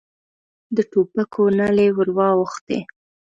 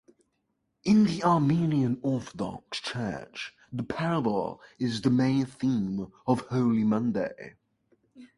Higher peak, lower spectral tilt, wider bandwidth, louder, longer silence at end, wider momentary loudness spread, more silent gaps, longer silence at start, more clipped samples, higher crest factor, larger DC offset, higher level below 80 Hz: first, -4 dBFS vs -10 dBFS; about the same, -7.5 dB/octave vs -7 dB/octave; second, 7.8 kHz vs 11.5 kHz; first, -19 LUFS vs -28 LUFS; first, 0.5 s vs 0.15 s; second, 10 LU vs 13 LU; first, 2.61-2.67 s vs none; second, 0.7 s vs 0.85 s; neither; about the same, 16 dB vs 18 dB; neither; about the same, -60 dBFS vs -60 dBFS